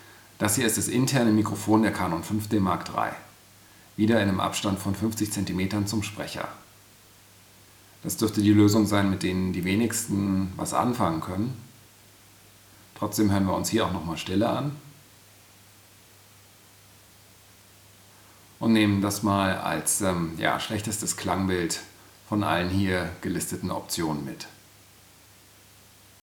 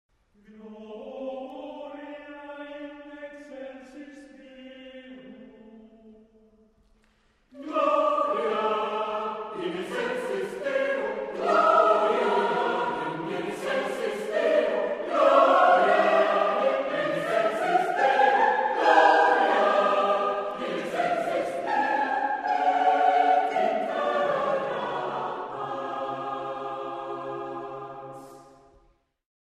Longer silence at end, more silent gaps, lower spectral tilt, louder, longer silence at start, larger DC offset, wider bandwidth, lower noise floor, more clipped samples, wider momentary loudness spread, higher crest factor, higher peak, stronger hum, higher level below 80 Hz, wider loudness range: first, 1.7 s vs 1.15 s; neither; about the same, -5 dB/octave vs -4.5 dB/octave; about the same, -26 LUFS vs -25 LUFS; second, 0 s vs 0.5 s; neither; first, over 20 kHz vs 13 kHz; second, -54 dBFS vs -65 dBFS; neither; second, 11 LU vs 21 LU; about the same, 22 dB vs 20 dB; about the same, -6 dBFS vs -6 dBFS; neither; first, -62 dBFS vs -68 dBFS; second, 7 LU vs 18 LU